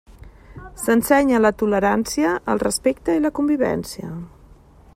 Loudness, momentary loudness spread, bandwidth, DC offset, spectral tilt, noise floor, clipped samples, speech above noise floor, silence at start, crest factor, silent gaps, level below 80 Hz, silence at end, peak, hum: -19 LUFS; 15 LU; 16 kHz; under 0.1%; -5 dB/octave; -48 dBFS; under 0.1%; 29 dB; 0.25 s; 16 dB; none; -46 dBFS; 0.65 s; -4 dBFS; none